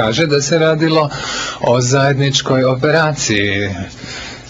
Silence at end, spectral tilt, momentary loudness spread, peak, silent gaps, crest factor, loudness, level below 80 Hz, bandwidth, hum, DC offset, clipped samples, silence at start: 0 s; -4.5 dB/octave; 9 LU; -2 dBFS; none; 12 dB; -14 LUFS; -44 dBFS; 8 kHz; none; under 0.1%; under 0.1%; 0 s